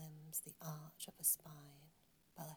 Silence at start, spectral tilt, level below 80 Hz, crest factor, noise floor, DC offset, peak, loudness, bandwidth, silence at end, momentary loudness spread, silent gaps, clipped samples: 0 s; -3 dB/octave; -84 dBFS; 26 dB; -73 dBFS; under 0.1%; -22 dBFS; -42 LUFS; over 20 kHz; 0 s; 21 LU; none; under 0.1%